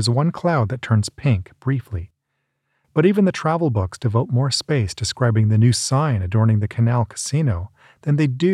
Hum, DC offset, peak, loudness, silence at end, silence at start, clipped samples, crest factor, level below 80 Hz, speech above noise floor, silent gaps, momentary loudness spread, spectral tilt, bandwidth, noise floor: none; under 0.1%; -4 dBFS; -20 LUFS; 0 s; 0 s; under 0.1%; 16 dB; -46 dBFS; 56 dB; none; 8 LU; -6 dB/octave; 12 kHz; -74 dBFS